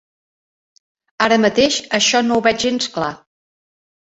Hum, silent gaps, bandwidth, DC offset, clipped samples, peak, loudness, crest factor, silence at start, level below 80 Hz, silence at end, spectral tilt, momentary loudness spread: none; none; 8.2 kHz; under 0.1%; under 0.1%; -2 dBFS; -16 LUFS; 18 dB; 1.2 s; -54 dBFS; 0.95 s; -2.5 dB/octave; 8 LU